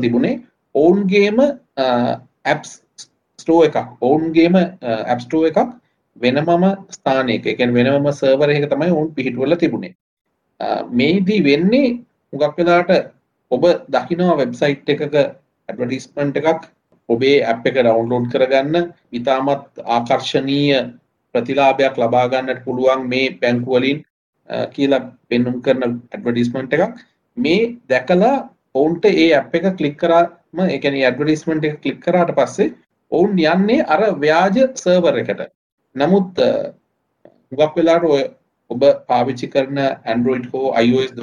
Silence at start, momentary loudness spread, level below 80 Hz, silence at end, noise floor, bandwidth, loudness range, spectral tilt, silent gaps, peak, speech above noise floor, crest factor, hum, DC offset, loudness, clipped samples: 0 s; 9 LU; -56 dBFS; 0 s; -52 dBFS; 10 kHz; 3 LU; -6.5 dB/octave; 9.95-10.25 s, 24.10-24.33 s, 35.55-35.78 s; -2 dBFS; 36 dB; 14 dB; none; under 0.1%; -17 LUFS; under 0.1%